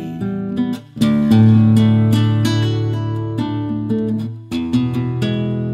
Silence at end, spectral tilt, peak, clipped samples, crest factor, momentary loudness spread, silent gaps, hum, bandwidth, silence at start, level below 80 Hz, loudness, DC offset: 0 s; -8 dB/octave; -2 dBFS; under 0.1%; 12 dB; 11 LU; none; none; 12.5 kHz; 0 s; -46 dBFS; -17 LUFS; under 0.1%